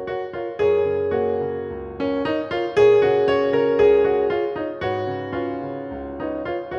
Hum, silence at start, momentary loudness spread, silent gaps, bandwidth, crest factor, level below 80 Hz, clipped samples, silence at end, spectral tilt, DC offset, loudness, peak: none; 0 s; 13 LU; none; 6.6 kHz; 16 dB; -48 dBFS; under 0.1%; 0 s; -7 dB/octave; under 0.1%; -21 LUFS; -6 dBFS